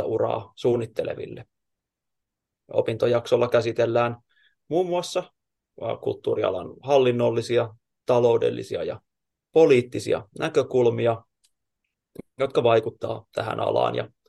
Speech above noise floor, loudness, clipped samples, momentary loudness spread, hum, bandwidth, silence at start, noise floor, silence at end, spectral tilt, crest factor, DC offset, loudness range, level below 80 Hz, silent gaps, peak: 61 dB; -24 LUFS; under 0.1%; 12 LU; none; 12.5 kHz; 0 s; -84 dBFS; 0.2 s; -6.5 dB/octave; 18 dB; under 0.1%; 4 LU; -66 dBFS; none; -6 dBFS